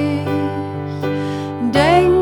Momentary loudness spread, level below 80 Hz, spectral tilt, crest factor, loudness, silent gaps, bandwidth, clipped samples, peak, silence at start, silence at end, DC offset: 11 LU; -40 dBFS; -7 dB/octave; 14 dB; -18 LUFS; none; 17.5 kHz; under 0.1%; -2 dBFS; 0 s; 0 s; under 0.1%